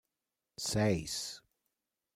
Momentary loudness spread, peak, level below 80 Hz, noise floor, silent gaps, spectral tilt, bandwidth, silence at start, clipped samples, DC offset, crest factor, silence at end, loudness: 19 LU; -18 dBFS; -60 dBFS; -89 dBFS; none; -4.5 dB/octave; 16 kHz; 0.6 s; under 0.1%; under 0.1%; 20 dB; 0.75 s; -35 LUFS